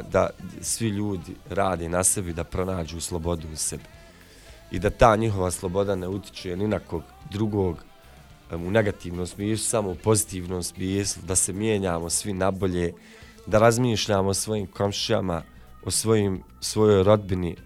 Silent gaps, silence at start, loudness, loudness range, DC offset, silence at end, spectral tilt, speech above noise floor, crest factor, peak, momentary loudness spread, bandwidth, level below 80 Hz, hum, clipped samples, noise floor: none; 0 s; -25 LUFS; 4 LU; under 0.1%; 0 s; -4.5 dB/octave; 25 dB; 22 dB; -2 dBFS; 13 LU; 16 kHz; -44 dBFS; none; under 0.1%; -49 dBFS